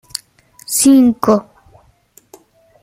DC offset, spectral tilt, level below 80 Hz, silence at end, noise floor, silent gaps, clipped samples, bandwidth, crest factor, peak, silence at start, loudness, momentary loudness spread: under 0.1%; -4 dB/octave; -52 dBFS; 1.4 s; -51 dBFS; none; under 0.1%; 16 kHz; 16 dB; 0 dBFS; 0.7 s; -12 LUFS; 18 LU